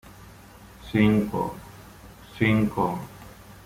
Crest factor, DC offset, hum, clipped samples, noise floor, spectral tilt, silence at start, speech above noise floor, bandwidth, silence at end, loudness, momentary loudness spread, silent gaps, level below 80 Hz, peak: 20 dB; under 0.1%; none; under 0.1%; -48 dBFS; -7.5 dB/octave; 0.05 s; 25 dB; 16 kHz; 0.1 s; -24 LUFS; 24 LU; none; -50 dBFS; -6 dBFS